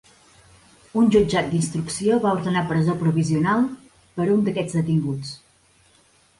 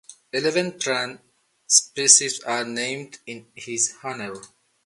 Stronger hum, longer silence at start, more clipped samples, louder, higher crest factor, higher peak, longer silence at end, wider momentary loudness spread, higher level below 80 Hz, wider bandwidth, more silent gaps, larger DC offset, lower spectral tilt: neither; first, 0.95 s vs 0.1 s; neither; about the same, -21 LUFS vs -20 LUFS; second, 16 dB vs 24 dB; second, -6 dBFS vs 0 dBFS; first, 1 s vs 0.4 s; second, 11 LU vs 23 LU; first, -52 dBFS vs -74 dBFS; about the same, 11.5 kHz vs 12 kHz; neither; neither; first, -6.5 dB/octave vs -0.5 dB/octave